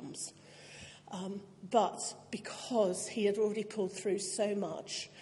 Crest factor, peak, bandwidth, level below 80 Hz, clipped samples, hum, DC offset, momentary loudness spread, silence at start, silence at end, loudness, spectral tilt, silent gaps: 22 dB; -14 dBFS; 11.5 kHz; -80 dBFS; under 0.1%; none; under 0.1%; 15 LU; 0 s; 0 s; -35 LUFS; -4 dB/octave; none